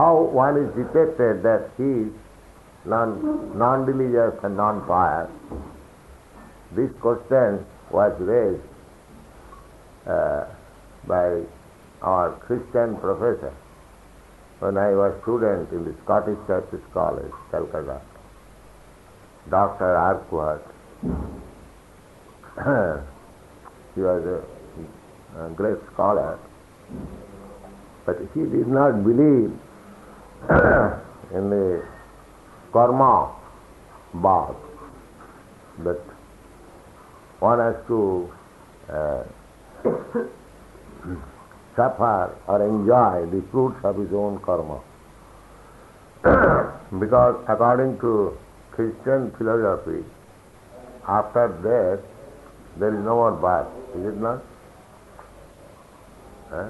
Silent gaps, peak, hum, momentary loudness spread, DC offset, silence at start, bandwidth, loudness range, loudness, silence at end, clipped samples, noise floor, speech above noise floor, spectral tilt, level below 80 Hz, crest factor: none; -4 dBFS; none; 20 LU; under 0.1%; 0 s; 12 kHz; 8 LU; -22 LUFS; 0 s; under 0.1%; -48 dBFS; 27 dB; -9 dB/octave; -46 dBFS; 20 dB